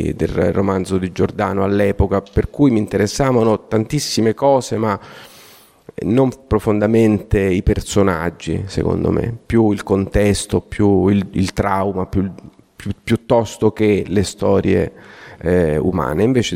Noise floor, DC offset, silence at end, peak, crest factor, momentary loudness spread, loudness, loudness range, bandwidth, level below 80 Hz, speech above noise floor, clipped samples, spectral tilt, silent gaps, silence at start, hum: -45 dBFS; under 0.1%; 0 s; -2 dBFS; 14 dB; 7 LU; -17 LUFS; 2 LU; 16 kHz; -34 dBFS; 29 dB; under 0.1%; -6.5 dB/octave; none; 0 s; none